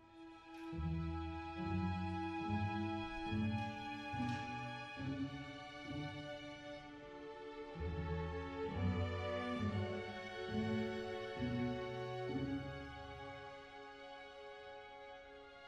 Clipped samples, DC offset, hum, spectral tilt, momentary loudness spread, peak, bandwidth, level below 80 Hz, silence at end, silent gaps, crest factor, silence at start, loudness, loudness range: under 0.1%; under 0.1%; none; -7 dB/octave; 13 LU; -28 dBFS; 9.6 kHz; -58 dBFS; 0 s; none; 16 dB; 0 s; -44 LUFS; 6 LU